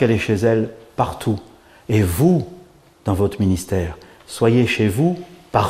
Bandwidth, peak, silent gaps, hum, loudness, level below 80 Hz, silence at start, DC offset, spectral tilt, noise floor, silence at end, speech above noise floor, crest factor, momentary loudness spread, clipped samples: 15.5 kHz; 0 dBFS; none; none; -19 LUFS; -42 dBFS; 0 s; under 0.1%; -6.5 dB/octave; -47 dBFS; 0 s; 29 dB; 18 dB; 13 LU; under 0.1%